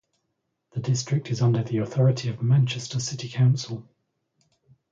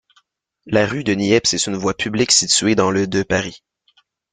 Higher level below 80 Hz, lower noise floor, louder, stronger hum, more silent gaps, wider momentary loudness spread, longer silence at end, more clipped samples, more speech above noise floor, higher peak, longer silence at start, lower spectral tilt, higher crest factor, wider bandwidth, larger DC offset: second, -62 dBFS vs -50 dBFS; first, -78 dBFS vs -61 dBFS; second, -24 LUFS vs -17 LUFS; neither; neither; about the same, 10 LU vs 8 LU; first, 1.1 s vs 0.75 s; neither; first, 54 dB vs 43 dB; second, -10 dBFS vs -2 dBFS; about the same, 0.75 s vs 0.65 s; first, -6 dB/octave vs -3 dB/octave; about the same, 16 dB vs 18 dB; second, 7.6 kHz vs 9.6 kHz; neither